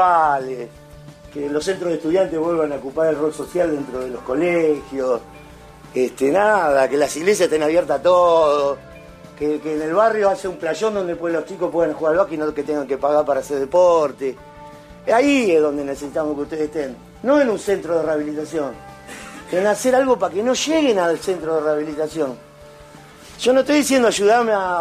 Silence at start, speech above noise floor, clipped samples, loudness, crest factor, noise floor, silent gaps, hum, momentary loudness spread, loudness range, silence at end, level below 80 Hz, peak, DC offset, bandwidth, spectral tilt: 0 s; 24 dB; under 0.1%; -19 LUFS; 16 dB; -42 dBFS; none; none; 11 LU; 4 LU; 0 s; -52 dBFS; -4 dBFS; under 0.1%; 15 kHz; -4.5 dB/octave